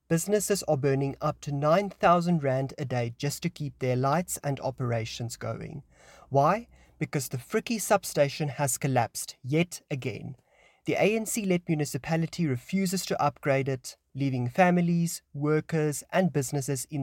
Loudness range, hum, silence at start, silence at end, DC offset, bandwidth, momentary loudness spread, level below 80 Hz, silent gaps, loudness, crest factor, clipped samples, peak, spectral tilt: 4 LU; none; 0.1 s; 0 s; under 0.1%; 17 kHz; 10 LU; -60 dBFS; none; -28 LUFS; 18 dB; under 0.1%; -10 dBFS; -5.5 dB/octave